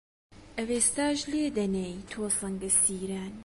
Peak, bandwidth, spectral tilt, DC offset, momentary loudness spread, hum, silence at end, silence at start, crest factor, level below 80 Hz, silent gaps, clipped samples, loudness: -10 dBFS; 12 kHz; -3 dB/octave; under 0.1%; 13 LU; none; 0 s; 0.3 s; 20 dB; -54 dBFS; none; under 0.1%; -28 LUFS